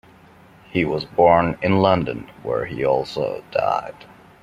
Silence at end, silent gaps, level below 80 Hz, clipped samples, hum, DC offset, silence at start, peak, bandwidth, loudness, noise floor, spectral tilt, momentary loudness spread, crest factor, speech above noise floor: 0.5 s; none; -50 dBFS; under 0.1%; none; under 0.1%; 0.75 s; -2 dBFS; 11 kHz; -20 LUFS; -48 dBFS; -7.5 dB/octave; 11 LU; 20 dB; 29 dB